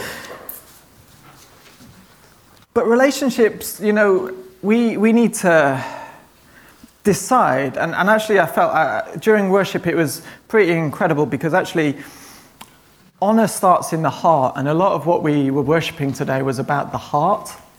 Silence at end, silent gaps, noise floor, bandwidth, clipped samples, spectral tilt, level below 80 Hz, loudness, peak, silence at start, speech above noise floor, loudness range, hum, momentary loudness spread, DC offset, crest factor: 0.2 s; none; -51 dBFS; 19.5 kHz; under 0.1%; -5.5 dB/octave; -56 dBFS; -17 LUFS; -2 dBFS; 0 s; 34 dB; 3 LU; none; 9 LU; under 0.1%; 16 dB